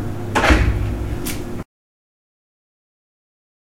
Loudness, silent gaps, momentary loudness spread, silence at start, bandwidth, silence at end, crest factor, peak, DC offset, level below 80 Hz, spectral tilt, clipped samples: -20 LUFS; none; 17 LU; 0 s; 16 kHz; 2 s; 22 dB; 0 dBFS; under 0.1%; -26 dBFS; -5.5 dB/octave; under 0.1%